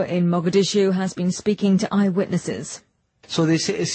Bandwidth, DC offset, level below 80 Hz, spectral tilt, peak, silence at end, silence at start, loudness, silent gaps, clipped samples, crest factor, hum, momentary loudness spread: 8.8 kHz; under 0.1%; -60 dBFS; -5.5 dB/octave; -6 dBFS; 0 s; 0 s; -21 LUFS; none; under 0.1%; 14 dB; none; 10 LU